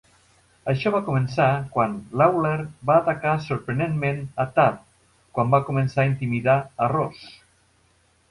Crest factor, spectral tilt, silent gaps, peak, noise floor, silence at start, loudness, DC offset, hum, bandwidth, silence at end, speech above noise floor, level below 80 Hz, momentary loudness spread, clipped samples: 18 dB; -8 dB/octave; none; -6 dBFS; -62 dBFS; 0.65 s; -23 LUFS; under 0.1%; none; 11.5 kHz; 1 s; 40 dB; -54 dBFS; 7 LU; under 0.1%